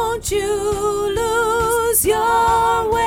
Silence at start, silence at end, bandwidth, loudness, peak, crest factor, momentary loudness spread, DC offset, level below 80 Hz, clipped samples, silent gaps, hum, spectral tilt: 0 s; 0 s; over 20 kHz; -17 LUFS; -4 dBFS; 12 dB; 5 LU; under 0.1%; -36 dBFS; under 0.1%; none; none; -3 dB/octave